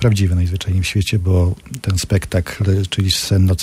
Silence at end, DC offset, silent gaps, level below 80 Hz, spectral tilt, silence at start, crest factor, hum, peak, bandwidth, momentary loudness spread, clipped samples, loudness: 0 s; under 0.1%; none; -32 dBFS; -5.5 dB/octave; 0 s; 14 dB; none; -2 dBFS; 15 kHz; 5 LU; under 0.1%; -17 LUFS